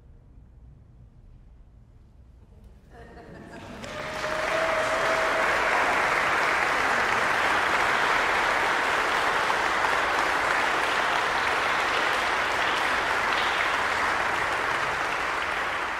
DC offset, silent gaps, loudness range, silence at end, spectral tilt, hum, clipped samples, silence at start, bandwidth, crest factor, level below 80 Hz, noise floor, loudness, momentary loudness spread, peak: under 0.1%; none; 7 LU; 0 s; -2 dB/octave; none; under 0.1%; 0.35 s; 16 kHz; 18 dB; -52 dBFS; -52 dBFS; -24 LUFS; 4 LU; -8 dBFS